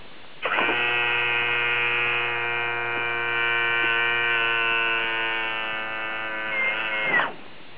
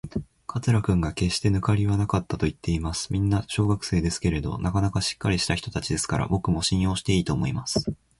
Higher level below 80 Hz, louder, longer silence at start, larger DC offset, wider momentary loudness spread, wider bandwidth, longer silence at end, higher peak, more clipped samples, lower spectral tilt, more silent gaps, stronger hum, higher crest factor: second, -66 dBFS vs -38 dBFS; first, -22 LUFS vs -25 LUFS; about the same, 0 s vs 0.05 s; first, 1% vs under 0.1%; about the same, 7 LU vs 5 LU; second, 4 kHz vs 11.5 kHz; second, 0 s vs 0.25 s; about the same, -8 dBFS vs -8 dBFS; neither; second, 0.5 dB/octave vs -5.5 dB/octave; neither; neither; about the same, 16 dB vs 16 dB